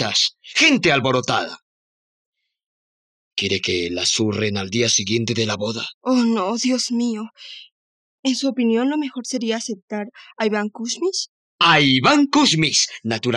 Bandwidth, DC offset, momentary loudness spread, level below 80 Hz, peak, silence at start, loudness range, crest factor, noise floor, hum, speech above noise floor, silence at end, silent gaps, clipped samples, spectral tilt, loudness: 11 kHz; under 0.1%; 14 LU; -62 dBFS; -4 dBFS; 0 s; 6 LU; 18 dB; under -90 dBFS; none; over 70 dB; 0 s; 1.62-2.33 s, 2.66-3.31 s, 5.94-6.01 s, 7.72-8.23 s, 9.82-9.88 s, 11.29-11.59 s; under 0.1%; -3 dB/octave; -19 LUFS